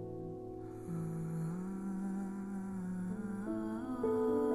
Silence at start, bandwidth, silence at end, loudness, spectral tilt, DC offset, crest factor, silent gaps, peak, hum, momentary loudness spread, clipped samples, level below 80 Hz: 0 s; 15 kHz; 0 s; -40 LUFS; -9 dB/octave; under 0.1%; 14 dB; none; -24 dBFS; none; 11 LU; under 0.1%; -60 dBFS